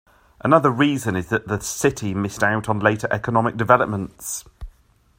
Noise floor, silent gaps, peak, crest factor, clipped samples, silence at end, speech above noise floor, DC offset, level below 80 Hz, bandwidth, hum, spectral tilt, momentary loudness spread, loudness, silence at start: -53 dBFS; none; 0 dBFS; 22 dB; under 0.1%; 0.5 s; 33 dB; under 0.1%; -48 dBFS; 16 kHz; none; -5.5 dB/octave; 11 LU; -21 LUFS; 0.45 s